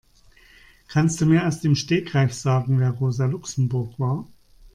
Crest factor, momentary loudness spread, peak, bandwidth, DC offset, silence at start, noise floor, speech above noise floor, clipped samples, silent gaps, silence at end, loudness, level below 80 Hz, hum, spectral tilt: 16 dB; 7 LU; -6 dBFS; 11 kHz; under 0.1%; 0.9 s; -53 dBFS; 32 dB; under 0.1%; none; 0.05 s; -22 LUFS; -52 dBFS; none; -6.5 dB/octave